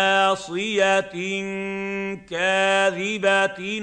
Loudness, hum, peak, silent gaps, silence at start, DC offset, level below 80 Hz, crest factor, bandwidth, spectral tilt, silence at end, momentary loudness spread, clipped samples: -22 LUFS; none; -6 dBFS; none; 0 s; under 0.1%; -62 dBFS; 16 dB; 9.8 kHz; -3.5 dB/octave; 0 s; 9 LU; under 0.1%